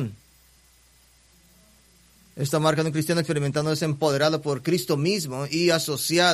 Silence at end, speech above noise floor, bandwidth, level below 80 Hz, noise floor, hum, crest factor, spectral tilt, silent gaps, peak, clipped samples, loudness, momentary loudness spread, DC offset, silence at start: 0 s; 34 dB; 15 kHz; -62 dBFS; -57 dBFS; none; 18 dB; -4.5 dB/octave; none; -6 dBFS; under 0.1%; -24 LUFS; 5 LU; under 0.1%; 0 s